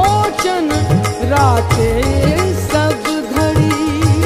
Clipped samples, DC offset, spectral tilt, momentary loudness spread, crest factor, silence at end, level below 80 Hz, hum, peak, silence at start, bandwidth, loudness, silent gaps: under 0.1%; under 0.1%; -5.5 dB/octave; 4 LU; 12 dB; 0 s; -28 dBFS; none; 0 dBFS; 0 s; 15.5 kHz; -14 LUFS; none